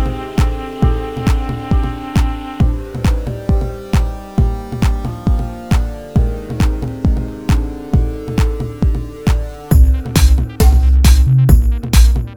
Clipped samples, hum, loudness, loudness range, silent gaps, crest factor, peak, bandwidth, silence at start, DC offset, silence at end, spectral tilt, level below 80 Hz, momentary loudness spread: under 0.1%; none; -16 LUFS; 5 LU; none; 14 dB; 0 dBFS; 18 kHz; 0 s; 0.3%; 0 s; -6.5 dB/octave; -14 dBFS; 8 LU